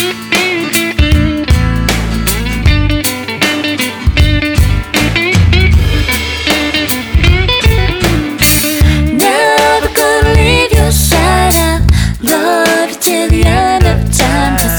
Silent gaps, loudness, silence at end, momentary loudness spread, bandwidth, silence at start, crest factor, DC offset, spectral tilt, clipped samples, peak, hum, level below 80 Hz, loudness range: none; -10 LUFS; 0 s; 5 LU; over 20 kHz; 0 s; 10 dB; under 0.1%; -4.5 dB/octave; under 0.1%; 0 dBFS; none; -16 dBFS; 3 LU